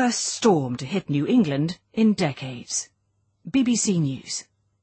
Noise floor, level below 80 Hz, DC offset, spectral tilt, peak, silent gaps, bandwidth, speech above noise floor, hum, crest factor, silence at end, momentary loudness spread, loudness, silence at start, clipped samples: -70 dBFS; -62 dBFS; under 0.1%; -4.5 dB/octave; -6 dBFS; none; 8.8 kHz; 47 dB; none; 18 dB; 0.4 s; 10 LU; -23 LUFS; 0 s; under 0.1%